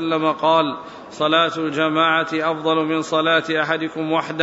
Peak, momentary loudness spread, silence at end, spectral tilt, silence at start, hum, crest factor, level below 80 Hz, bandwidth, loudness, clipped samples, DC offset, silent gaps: -4 dBFS; 6 LU; 0 s; -5 dB/octave; 0 s; none; 16 dB; -64 dBFS; 8 kHz; -19 LUFS; under 0.1%; under 0.1%; none